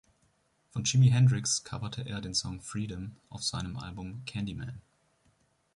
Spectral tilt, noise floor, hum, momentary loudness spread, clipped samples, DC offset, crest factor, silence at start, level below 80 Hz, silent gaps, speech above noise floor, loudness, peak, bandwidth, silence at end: -4.5 dB/octave; -71 dBFS; none; 17 LU; under 0.1%; under 0.1%; 18 dB; 0.75 s; -54 dBFS; none; 41 dB; -30 LUFS; -12 dBFS; 11.5 kHz; 0.95 s